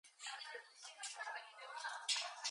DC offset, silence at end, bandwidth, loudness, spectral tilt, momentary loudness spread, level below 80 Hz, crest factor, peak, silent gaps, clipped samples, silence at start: under 0.1%; 0 s; 11 kHz; -45 LUFS; 6.5 dB/octave; 12 LU; under -90 dBFS; 24 dB; -24 dBFS; none; under 0.1%; 0.05 s